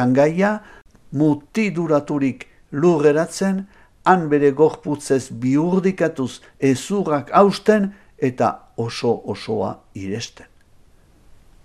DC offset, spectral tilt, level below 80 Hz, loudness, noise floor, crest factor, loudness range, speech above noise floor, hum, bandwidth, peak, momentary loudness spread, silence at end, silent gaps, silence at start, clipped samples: under 0.1%; -6.5 dB/octave; -54 dBFS; -20 LUFS; -51 dBFS; 20 dB; 5 LU; 32 dB; none; 14 kHz; 0 dBFS; 13 LU; 1.35 s; none; 0 s; under 0.1%